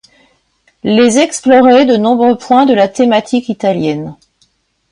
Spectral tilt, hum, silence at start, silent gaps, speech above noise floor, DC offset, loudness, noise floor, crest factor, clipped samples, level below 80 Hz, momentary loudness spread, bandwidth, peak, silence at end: -4.5 dB/octave; none; 0.85 s; none; 47 dB; under 0.1%; -10 LUFS; -57 dBFS; 12 dB; under 0.1%; -54 dBFS; 10 LU; 11 kHz; 0 dBFS; 0.8 s